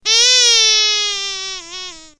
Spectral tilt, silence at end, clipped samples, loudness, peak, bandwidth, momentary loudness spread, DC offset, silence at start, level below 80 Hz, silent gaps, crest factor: 4 dB/octave; 0.15 s; under 0.1%; -11 LUFS; 0 dBFS; 11 kHz; 19 LU; under 0.1%; 0.05 s; -52 dBFS; none; 16 dB